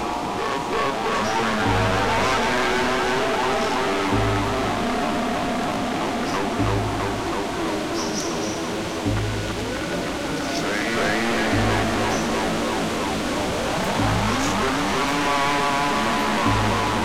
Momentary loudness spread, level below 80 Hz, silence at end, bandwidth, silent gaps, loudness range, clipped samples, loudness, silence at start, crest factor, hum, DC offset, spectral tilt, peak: 5 LU; -38 dBFS; 0 s; 16.5 kHz; none; 4 LU; under 0.1%; -22 LUFS; 0 s; 14 dB; none; 0.9%; -4.5 dB/octave; -8 dBFS